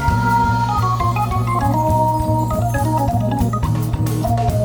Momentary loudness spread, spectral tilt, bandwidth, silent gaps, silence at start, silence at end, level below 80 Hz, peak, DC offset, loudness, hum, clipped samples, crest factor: 3 LU; -7 dB/octave; over 20 kHz; none; 0 s; 0 s; -28 dBFS; -4 dBFS; under 0.1%; -18 LUFS; none; under 0.1%; 14 dB